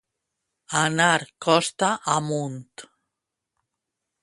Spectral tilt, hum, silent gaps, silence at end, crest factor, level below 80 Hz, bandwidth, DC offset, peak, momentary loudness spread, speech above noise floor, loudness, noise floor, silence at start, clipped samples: -3.5 dB/octave; none; none; 1.4 s; 22 dB; -68 dBFS; 11.5 kHz; under 0.1%; -4 dBFS; 9 LU; 61 dB; -22 LUFS; -84 dBFS; 0.7 s; under 0.1%